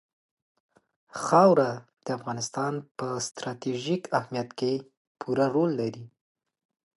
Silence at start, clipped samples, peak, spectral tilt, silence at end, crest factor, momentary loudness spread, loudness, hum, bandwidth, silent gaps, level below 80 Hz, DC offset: 1.15 s; under 0.1%; -6 dBFS; -5.5 dB/octave; 0.9 s; 22 dB; 14 LU; -27 LUFS; none; 11.5 kHz; 2.91-2.95 s, 4.97-5.15 s; -74 dBFS; under 0.1%